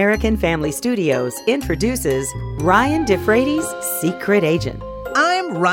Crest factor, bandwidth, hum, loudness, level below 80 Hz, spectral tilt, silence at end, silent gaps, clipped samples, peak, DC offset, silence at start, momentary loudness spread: 16 dB; 17 kHz; none; -18 LUFS; -34 dBFS; -5 dB/octave; 0 s; none; under 0.1%; -2 dBFS; under 0.1%; 0 s; 6 LU